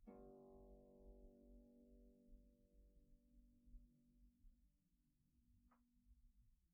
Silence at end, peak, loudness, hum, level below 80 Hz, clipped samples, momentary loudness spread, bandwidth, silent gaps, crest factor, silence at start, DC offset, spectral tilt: 0 s; -50 dBFS; -67 LUFS; none; -72 dBFS; under 0.1%; 5 LU; 1.5 kHz; none; 18 dB; 0 s; under 0.1%; -4.5 dB/octave